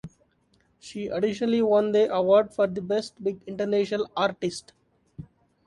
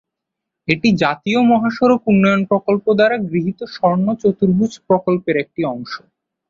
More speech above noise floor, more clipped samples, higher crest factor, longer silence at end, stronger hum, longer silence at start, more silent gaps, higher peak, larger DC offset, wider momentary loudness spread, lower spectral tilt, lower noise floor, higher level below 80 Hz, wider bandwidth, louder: second, 42 dB vs 65 dB; neither; about the same, 18 dB vs 14 dB; about the same, 0.45 s vs 0.55 s; neither; second, 0.05 s vs 0.7 s; neither; second, -8 dBFS vs -2 dBFS; neither; first, 18 LU vs 9 LU; about the same, -6 dB/octave vs -7 dB/octave; second, -66 dBFS vs -81 dBFS; second, -64 dBFS vs -54 dBFS; first, 11.5 kHz vs 7.4 kHz; second, -25 LUFS vs -16 LUFS